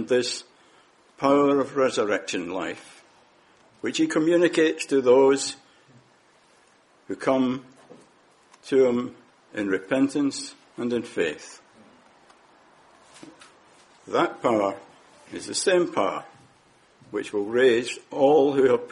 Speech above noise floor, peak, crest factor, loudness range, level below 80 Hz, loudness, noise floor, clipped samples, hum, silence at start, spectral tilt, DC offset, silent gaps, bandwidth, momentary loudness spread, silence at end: 36 dB; -6 dBFS; 18 dB; 9 LU; -68 dBFS; -23 LUFS; -59 dBFS; under 0.1%; none; 0 s; -4 dB/octave; under 0.1%; none; 11.5 kHz; 16 LU; 0.05 s